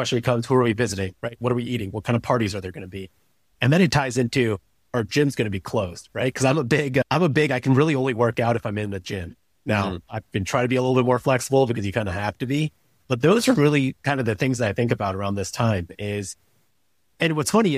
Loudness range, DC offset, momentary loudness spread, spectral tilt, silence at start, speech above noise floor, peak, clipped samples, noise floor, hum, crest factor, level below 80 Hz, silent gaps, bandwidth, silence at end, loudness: 3 LU; under 0.1%; 11 LU; -6 dB/octave; 0 s; 49 dB; -6 dBFS; under 0.1%; -71 dBFS; none; 18 dB; -52 dBFS; none; 15.5 kHz; 0 s; -22 LUFS